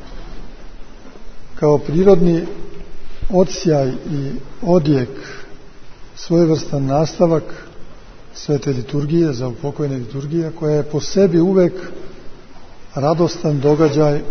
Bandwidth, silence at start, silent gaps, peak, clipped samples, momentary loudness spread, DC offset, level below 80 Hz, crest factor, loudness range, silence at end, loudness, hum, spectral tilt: 6.6 kHz; 0 s; none; 0 dBFS; under 0.1%; 21 LU; under 0.1%; -36 dBFS; 18 dB; 3 LU; 0 s; -17 LUFS; none; -7.5 dB/octave